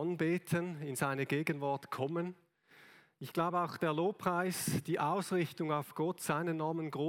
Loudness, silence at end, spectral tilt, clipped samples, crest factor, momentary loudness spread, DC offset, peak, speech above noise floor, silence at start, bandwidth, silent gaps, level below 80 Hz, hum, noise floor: -36 LUFS; 0 s; -5.5 dB/octave; under 0.1%; 18 dB; 4 LU; under 0.1%; -16 dBFS; 27 dB; 0 s; 17.5 kHz; none; -78 dBFS; none; -63 dBFS